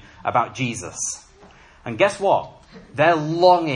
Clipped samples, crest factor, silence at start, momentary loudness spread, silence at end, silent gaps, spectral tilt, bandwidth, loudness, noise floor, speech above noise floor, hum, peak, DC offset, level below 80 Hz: under 0.1%; 18 dB; 0.25 s; 18 LU; 0 s; none; -4 dB/octave; 11.5 kHz; -20 LUFS; -48 dBFS; 29 dB; none; -2 dBFS; under 0.1%; -56 dBFS